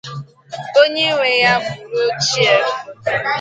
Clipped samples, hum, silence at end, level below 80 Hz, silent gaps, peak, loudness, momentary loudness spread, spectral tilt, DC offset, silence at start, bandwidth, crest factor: under 0.1%; none; 0 s; -58 dBFS; none; 0 dBFS; -15 LUFS; 18 LU; -2.5 dB/octave; under 0.1%; 0.05 s; 9.2 kHz; 16 dB